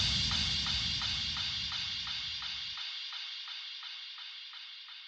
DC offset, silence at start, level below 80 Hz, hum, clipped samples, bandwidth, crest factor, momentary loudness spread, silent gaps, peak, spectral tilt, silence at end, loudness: under 0.1%; 0 s; -52 dBFS; none; under 0.1%; 9.4 kHz; 18 dB; 14 LU; none; -18 dBFS; -1.5 dB/octave; 0 s; -34 LUFS